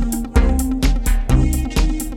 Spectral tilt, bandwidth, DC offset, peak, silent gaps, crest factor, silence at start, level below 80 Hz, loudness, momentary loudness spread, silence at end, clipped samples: -5.5 dB/octave; 17 kHz; under 0.1%; -2 dBFS; none; 14 dB; 0 s; -18 dBFS; -19 LUFS; 3 LU; 0 s; under 0.1%